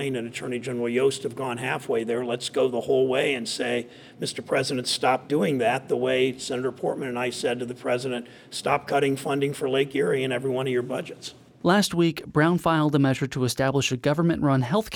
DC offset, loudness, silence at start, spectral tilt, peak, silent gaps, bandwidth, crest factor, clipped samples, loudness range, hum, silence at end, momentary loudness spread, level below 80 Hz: under 0.1%; -25 LUFS; 0 s; -5 dB/octave; -8 dBFS; none; 18.5 kHz; 18 dB; under 0.1%; 3 LU; none; 0 s; 9 LU; -58 dBFS